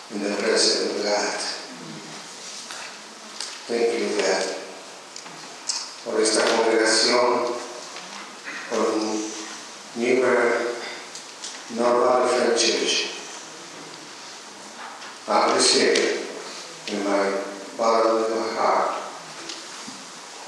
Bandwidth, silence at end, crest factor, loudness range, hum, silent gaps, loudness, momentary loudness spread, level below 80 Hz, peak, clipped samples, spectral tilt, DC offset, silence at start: 13 kHz; 0 s; 22 dB; 6 LU; none; none; -22 LUFS; 19 LU; -82 dBFS; -2 dBFS; under 0.1%; -1.5 dB/octave; under 0.1%; 0 s